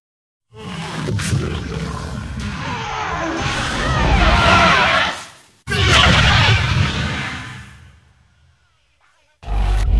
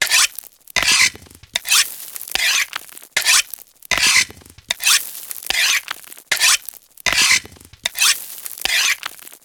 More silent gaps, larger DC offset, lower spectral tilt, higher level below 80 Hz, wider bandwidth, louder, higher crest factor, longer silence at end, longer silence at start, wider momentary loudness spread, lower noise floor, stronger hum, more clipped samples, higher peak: neither; neither; first, -4.5 dB/octave vs 2 dB/octave; first, -26 dBFS vs -50 dBFS; second, 12 kHz vs over 20 kHz; about the same, -16 LUFS vs -16 LUFS; about the same, 18 dB vs 20 dB; about the same, 0 s vs 0.1 s; first, 0.55 s vs 0 s; about the same, 17 LU vs 16 LU; first, -60 dBFS vs -38 dBFS; neither; neither; about the same, 0 dBFS vs 0 dBFS